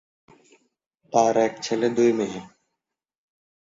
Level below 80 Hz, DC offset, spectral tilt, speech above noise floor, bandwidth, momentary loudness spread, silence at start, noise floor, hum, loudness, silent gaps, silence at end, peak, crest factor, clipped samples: -66 dBFS; under 0.1%; -5 dB/octave; 65 dB; 7.8 kHz; 9 LU; 1.15 s; -86 dBFS; none; -22 LUFS; none; 1.3 s; -4 dBFS; 22 dB; under 0.1%